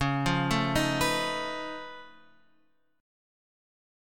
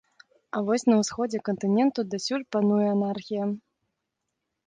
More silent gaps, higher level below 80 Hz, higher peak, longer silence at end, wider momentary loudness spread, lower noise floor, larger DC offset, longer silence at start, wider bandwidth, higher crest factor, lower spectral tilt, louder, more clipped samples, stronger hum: neither; first, -50 dBFS vs -70 dBFS; about the same, -12 dBFS vs -10 dBFS; about the same, 1 s vs 1.1 s; first, 15 LU vs 8 LU; second, -71 dBFS vs -82 dBFS; first, 0.3% vs under 0.1%; second, 0 s vs 0.55 s; first, 17.5 kHz vs 9.6 kHz; about the same, 20 dB vs 16 dB; about the same, -4.5 dB/octave vs -5.5 dB/octave; about the same, -28 LUFS vs -26 LUFS; neither; neither